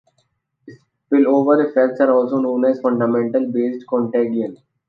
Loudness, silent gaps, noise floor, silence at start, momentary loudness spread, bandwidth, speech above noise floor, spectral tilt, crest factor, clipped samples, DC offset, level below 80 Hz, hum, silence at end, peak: -17 LUFS; none; -67 dBFS; 0.65 s; 7 LU; 5 kHz; 50 dB; -9.5 dB/octave; 16 dB; under 0.1%; under 0.1%; -70 dBFS; none; 0.35 s; -2 dBFS